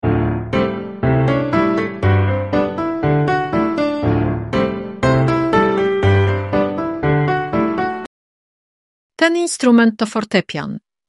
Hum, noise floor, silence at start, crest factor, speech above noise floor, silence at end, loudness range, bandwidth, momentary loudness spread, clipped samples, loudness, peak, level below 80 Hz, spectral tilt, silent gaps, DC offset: none; under -90 dBFS; 0.05 s; 16 dB; over 75 dB; 0.3 s; 2 LU; 11.5 kHz; 6 LU; under 0.1%; -17 LUFS; -2 dBFS; -38 dBFS; -6.5 dB/octave; 8.06-9.10 s; 0.2%